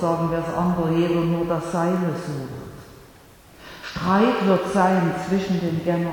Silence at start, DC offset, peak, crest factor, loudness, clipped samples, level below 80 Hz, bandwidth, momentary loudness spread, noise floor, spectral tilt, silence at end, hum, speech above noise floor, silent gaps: 0 s; under 0.1%; -6 dBFS; 16 dB; -22 LUFS; under 0.1%; -50 dBFS; 18.5 kHz; 16 LU; -48 dBFS; -7 dB/octave; 0 s; none; 27 dB; none